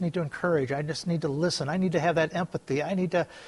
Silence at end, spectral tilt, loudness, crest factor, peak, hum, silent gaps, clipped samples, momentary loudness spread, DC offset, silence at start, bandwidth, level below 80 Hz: 0 s; -6 dB/octave; -28 LUFS; 16 dB; -12 dBFS; none; none; under 0.1%; 5 LU; under 0.1%; 0 s; 11.5 kHz; -62 dBFS